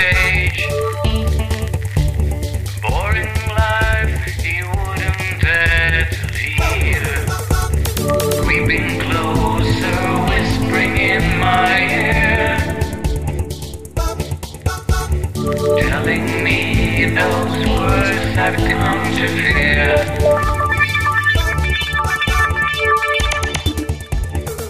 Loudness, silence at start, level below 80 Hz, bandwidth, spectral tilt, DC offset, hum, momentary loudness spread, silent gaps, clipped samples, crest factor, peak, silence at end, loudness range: -16 LUFS; 0 s; -24 dBFS; 15.5 kHz; -5 dB/octave; under 0.1%; none; 8 LU; none; under 0.1%; 14 dB; -2 dBFS; 0 s; 4 LU